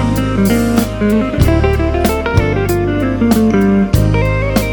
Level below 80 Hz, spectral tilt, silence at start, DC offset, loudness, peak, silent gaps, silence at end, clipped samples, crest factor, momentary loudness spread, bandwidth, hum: -22 dBFS; -7 dB/octave; 0 s; under 0.1%; -13 LUFS; 0 dBFS; none; 0 s; under 0.1%; 12 dB; 3 LU; 19.5 kHz; none